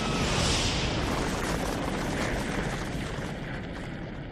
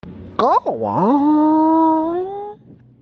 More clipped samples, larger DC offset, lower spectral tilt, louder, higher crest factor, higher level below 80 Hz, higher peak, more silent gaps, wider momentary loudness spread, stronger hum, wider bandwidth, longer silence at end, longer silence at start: neither; neither; second, -4 dB/octave vs -9 dB/octave; second, -30 LUFS vs -16 LUFS; about the same, 16 dB vs 14 dB; first, -38 dBFS vs -54 dBFS; second, -14 dBFS vs -4 dBFS; neither; second, 11 LU vs 14 LU; neither; first, 15 kHz vs 5.8 kHz; second, 0 s vs 0.45 s; about the same, 0 s vs 0.05 s